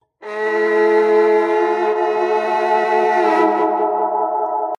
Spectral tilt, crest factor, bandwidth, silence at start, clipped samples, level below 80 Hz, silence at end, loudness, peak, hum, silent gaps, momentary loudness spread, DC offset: -5 dB/octave; 14 dB; 7.4 kHz; 0.2 s; under 0.1%; -72 dBFS; 0.05 s; -16 LUFS; -2 dBFS; none; none; 6 LU; under 0.1%